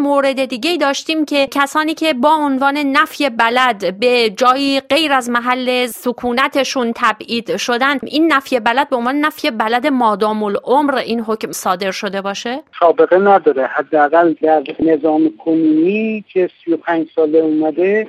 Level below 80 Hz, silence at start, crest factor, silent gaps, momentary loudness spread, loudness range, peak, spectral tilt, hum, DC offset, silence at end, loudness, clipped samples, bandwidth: -60 dBFS; 0 s; 14 dB; none; 6 LU; 3 LU; 0 dBFS; -4 dB/octave; none; under 0.1%; 0 s; -15 LUFS; under 0.1%; 15.5 kHz